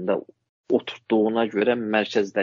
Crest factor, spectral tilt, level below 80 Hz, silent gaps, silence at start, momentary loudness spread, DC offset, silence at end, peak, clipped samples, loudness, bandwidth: 18 dB; -3.5 dB/octave; -70 dBFS; 0.49-0.64 s; 0 s; 4 LU; under 0.1%; 0 s; -6 dBFS; under 0.1%; -23 LUFS; 7.4 kHz